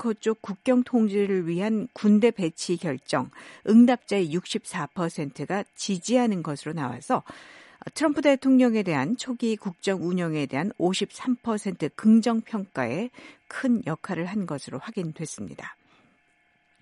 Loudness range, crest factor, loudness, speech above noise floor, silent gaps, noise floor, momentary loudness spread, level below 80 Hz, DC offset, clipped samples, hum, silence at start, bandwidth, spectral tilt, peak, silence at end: 7 LU; 18 dB; -25 LUFS; 41 dB; none; -66 dBFS; 14 LU; -70 dBFS; under 0.1%; under 0.1%; none; 0 s; 11.5 kHz; -6 dB/octave; -8 dBFS; 1.1 s